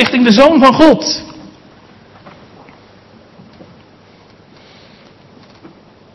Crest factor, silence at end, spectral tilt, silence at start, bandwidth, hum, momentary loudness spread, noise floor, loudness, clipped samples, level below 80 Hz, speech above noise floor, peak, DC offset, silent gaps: 14 dB; 4.8 s; -4.5 dB/octave; 0 s; 12 kHz; none; 14 LU; -43 dBFS; -8 LUFS; 0.7%; -44 dBFS; 35 dB; 0 dBFS; under 0.1%; none